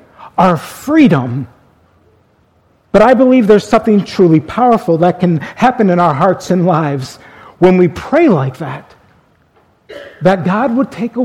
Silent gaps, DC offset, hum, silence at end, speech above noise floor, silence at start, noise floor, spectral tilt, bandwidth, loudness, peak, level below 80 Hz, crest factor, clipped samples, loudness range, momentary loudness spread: none; under 0.1%; none; 0 s; 42 dB; 0.2 s; -53 dBFS; -7.5 dB/octave; 15.5 kHz; -11 LUFS; 0 dBFS; -44 dBFS; 12 dB; 0.3%; 5 LU; 13 LU